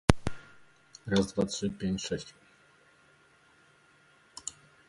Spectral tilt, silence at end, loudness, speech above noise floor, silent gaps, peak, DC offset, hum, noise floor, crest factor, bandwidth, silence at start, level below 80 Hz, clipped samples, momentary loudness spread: -5 dB/octave; 0.35 s; -33 LUFS; 32 dB; none; 0 dBFS; under 0.1%; none; -63 dBFS; 34 dB; 11.5 kHz; 0.1 s; -46 dBFS; under 0.1%; 21 LU